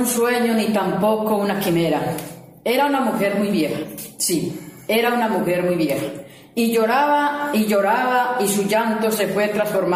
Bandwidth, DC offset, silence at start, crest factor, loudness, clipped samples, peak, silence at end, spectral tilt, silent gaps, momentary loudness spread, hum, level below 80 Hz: 16 kHz; under 0.1%; 0 s; 14 dB; -20 LUFS; under 0.1%; -6 dBFS; 0 s; -4.5 dB/octave; none; 10 LU; none; -58 dBFS